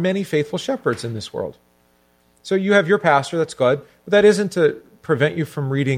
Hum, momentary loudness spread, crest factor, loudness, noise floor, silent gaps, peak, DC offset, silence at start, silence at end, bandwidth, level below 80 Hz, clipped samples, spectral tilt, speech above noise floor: 60 Hz at -55 dBFS; 13 LU; 18 dB; -19 LUFS; -59 dBFS; none; -2 dBFS; under 0.1%; 0 s; 0 s; 15 kHz; -60 dBFS; under 0.1%; -6 dB/octave; 40 dB